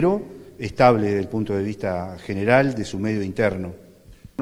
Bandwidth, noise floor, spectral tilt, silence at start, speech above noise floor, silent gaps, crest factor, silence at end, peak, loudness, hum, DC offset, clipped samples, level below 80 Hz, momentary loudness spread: 14 kHz; -46 dBFS; -7 dB/octave; 0 s; 25 dB; none; 22 dB; 0 s; -2 dBFS; -22 LUFS; none; under 0.1%; under 0.1%; -50 dBFS; 15 LU